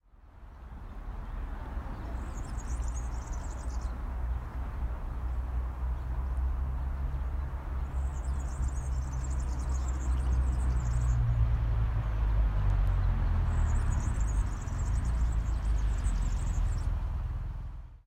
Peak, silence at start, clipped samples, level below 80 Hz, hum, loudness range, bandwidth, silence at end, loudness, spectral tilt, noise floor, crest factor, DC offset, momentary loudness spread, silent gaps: -18 dBFS; 0.25 s; under 0.1%; -32 dBFS; none; 8 LU; 9.2 kHz; 0.1 s; -34 LUFS; -6.5 dB/octave; -52 dBFS; 14 dB; under 0.1%; 10 LU; none